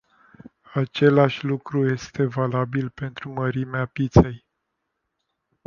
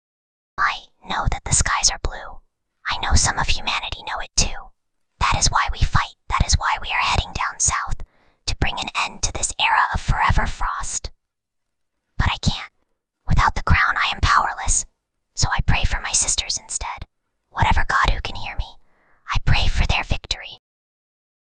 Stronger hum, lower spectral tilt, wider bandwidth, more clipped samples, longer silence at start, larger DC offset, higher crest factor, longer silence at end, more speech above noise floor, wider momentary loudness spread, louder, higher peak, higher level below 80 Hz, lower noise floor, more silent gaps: neither; first, -8 dB/octave vs -2 dB/octave; second, 7 kHz vs 10 kHz; neither; about the same, 0.7 s vs 0.6 s; neither; about the same, 22 dB vs 20 dB; first, 1.3 s vs 0.9 s; about the same, 56 dB vs 58 dB; about the same, 12 LU vs 14 LU; about the same, -23 LUFS vs -21 LUFS; about the same, -2 dBFS vs -2 dBFS; second, -40 dBFS vs -26 dBFS; about the same, -78 dBFS vs -78 dBFS; neither